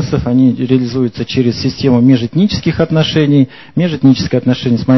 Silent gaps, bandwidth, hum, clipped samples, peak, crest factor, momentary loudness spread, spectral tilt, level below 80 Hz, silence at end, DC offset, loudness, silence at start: none; 6.2 kHz; none; 0.1%; 0 dBFS; 12 dB; 5 LU; -7.5 dB/octave; -36 dBFS; 0 s; 0.6%; -12 LUFS; 0 s